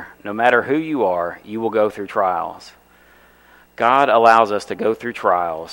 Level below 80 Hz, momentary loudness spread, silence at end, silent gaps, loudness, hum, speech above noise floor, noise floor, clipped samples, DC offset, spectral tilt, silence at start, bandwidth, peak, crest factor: -60 dBFS; 12 LU; 0 s; none; -18 LUFS; 60 Hz at -60 dBFS; 33 dB; -50 dBFS; under 0.1%; under 0.1%; -5 dB/octave; 0 s; 16.5 kHz; 0 dBFS; 18 dB